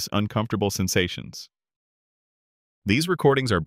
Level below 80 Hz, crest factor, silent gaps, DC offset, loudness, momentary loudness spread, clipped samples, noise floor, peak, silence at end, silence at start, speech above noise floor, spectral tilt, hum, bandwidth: -52 dBFS; 20 dB; 1.76-2.82 s; under 0.1%; -23 LUFS; 15 LU; under 0.1%; under -90 dBFS; -6 dBFS; 0 s; 0 s; over 67 dB; -5 dB/octave; none; 16 kHz